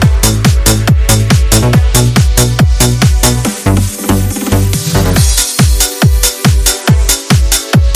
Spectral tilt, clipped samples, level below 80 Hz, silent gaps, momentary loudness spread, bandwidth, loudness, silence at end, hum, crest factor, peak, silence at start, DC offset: -4 dB/octave; 0.4%; -14 dBFS; none; 4 LU; over 20 kHz; -9 LUFS; 0 s; none; 8 dB; 0 dBFS; 0 s; under 0.1%